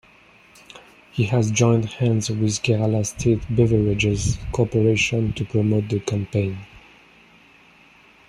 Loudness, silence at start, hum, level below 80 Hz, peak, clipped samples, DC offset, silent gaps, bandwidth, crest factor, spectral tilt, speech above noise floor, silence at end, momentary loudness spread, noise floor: -21 LUFS; 0.75 s; none; -42 dBFS; -4 dBFS; under 0.1%; under 0.1%; none; 11.5 kHz; 18 dB; -5.5 dB/octave; 32 dB; 1.65 s; 6 LU; -52 dBFS